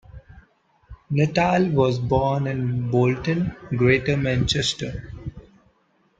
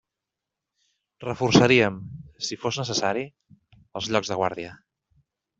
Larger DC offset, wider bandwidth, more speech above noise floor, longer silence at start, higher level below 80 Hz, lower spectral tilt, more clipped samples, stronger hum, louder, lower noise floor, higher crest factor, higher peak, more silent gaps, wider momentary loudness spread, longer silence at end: neither; first, 9.2 kHz vs 8 kHz; second, 43 dB vs 63 dB; second, 0.15 s vs 1.2 s; first, -44 dBFS vs -56 dBFS; first, -6 dB/octave vs -4.5 dB/octave; neither; neither; about the same, -22 LUFS vs -23 LUFS; second, -64 dBFS vs -86 dBFS; about the same, 20 dB vs 24 dB; about the same, -4 dBFS vs -2 dBFS; neither; second, 12 LU vs 21 LU; about the same, 0.8 s vs 0.85 s